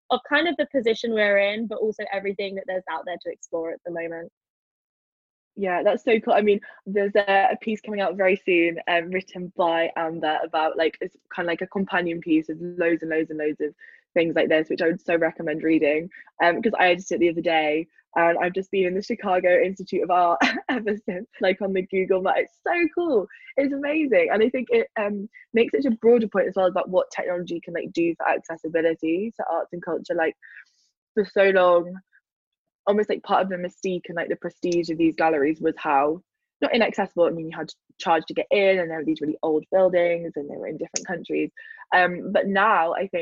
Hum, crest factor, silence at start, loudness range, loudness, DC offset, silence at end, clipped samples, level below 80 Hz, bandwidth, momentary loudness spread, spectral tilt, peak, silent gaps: none; 18 dB; 0.1 s; 4 LU; -23 LUFS; under 0.1%; 0 s; under 0.1%; -66 dBFS; 7.8 kHz; 11 LU; -5 dB/octave; -6 dBFS; 4.32-4.41 s, 4.50-5.51 s, 30.97-31.15 s, 32.32-32.52 s, 32.58-32.65 s, 32.74-32.84 s, 36.56-36.60 s